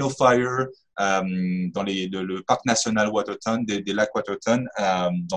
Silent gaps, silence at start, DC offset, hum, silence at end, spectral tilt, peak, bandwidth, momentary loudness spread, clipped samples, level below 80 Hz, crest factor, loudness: none; 0 s; under 0.1%; none; 0 s; -4.5 dB/octave; -4 dBFS; 10.5 kHz; 7 LU; under 0.1%; -58 dBFS; 20 dB; -24 LUFS